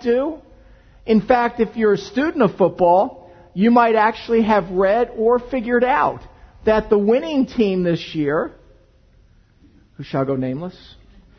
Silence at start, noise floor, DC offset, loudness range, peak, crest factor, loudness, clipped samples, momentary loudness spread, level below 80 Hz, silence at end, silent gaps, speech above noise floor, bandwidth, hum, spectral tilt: 0 s; -52 dBFS; under 0.1%; 7 LU; 0 dBFS; 18 dB; -18 LUFS; under 0.1%; 11 LU; -46 dBFS; 0.7 s; none; 35 dB; 6.4 kHz; none; -7.5 dB/octave